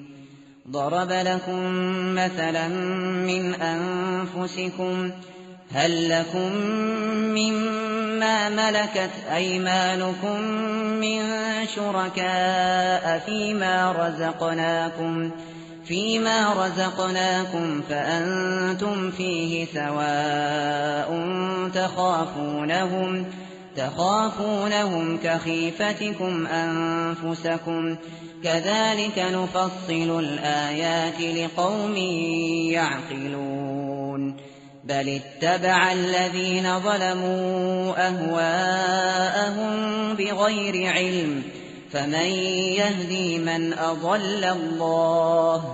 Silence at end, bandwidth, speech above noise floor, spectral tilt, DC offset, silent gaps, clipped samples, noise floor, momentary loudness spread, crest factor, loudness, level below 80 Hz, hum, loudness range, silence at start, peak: 0 s; 8 kHz; 23 dB; -3 dB/octave; under 0.1%; none; under 0.1%; -47 dBFS; 7 LU; 20 dB; -24 LUFS; -64 dBFS; none; 3 LU; 0 s; -6 dBFS